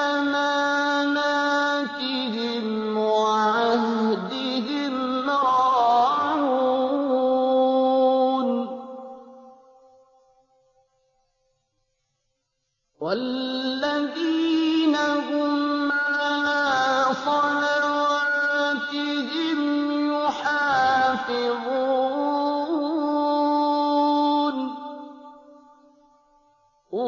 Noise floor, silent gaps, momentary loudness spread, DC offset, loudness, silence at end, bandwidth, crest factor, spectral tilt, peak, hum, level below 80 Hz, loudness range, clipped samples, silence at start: -77 dBFS; none; 6 LU; under 0.1%; -22 LUFS; 0 s; 7.4 kHz; 12 dB; -4 dB/octave; -10 dBFS; none; -68 dBFS; 6 LU; under 0.1%; 0 s